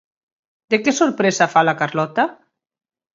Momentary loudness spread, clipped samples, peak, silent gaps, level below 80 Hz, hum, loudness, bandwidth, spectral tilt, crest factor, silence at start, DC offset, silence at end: 6 LU; under 0.1%; 0 dBFS; none; -68 dBFS; none; -18 LUFS; 7.8 kHz; -4 dB/octave; 20 dB; 0.7 s; under 0.1%; 0.8 s